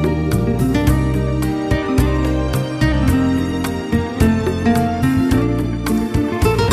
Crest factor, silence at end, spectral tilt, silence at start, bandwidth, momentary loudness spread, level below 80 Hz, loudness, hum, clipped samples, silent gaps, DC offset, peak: 14 dB; 0 s; -7 dB/octave; 0 s; 14 kHz; 4 LU; -24 dBFS; -17 LUFS; none; under 0.1%; none; under 0.1%; -2 dBFS